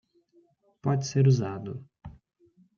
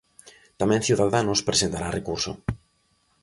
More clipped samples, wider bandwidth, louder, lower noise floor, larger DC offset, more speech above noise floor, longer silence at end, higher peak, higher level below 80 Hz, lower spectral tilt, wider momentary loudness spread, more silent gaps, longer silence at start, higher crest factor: neither; second, 7.2 kHz vs 11.5 kHz; second, -27 LUFS vs -24 LUFS; about the same, -64 dBFS vs -67 dBFS; neither; second, 39 dB vs 43 dB; about the same, 0.65 s vs 0.65 s; second, -12 dBFS vs -6 dBFS; second, -62 dBFS vs -46 dBFS; first, -7 dB/octave vs -4 dB/octave; first, 26 LU vs 11 LU; neither; first, 0.85 s vs 0.25 s; about the same, 18 dB vs 20 dB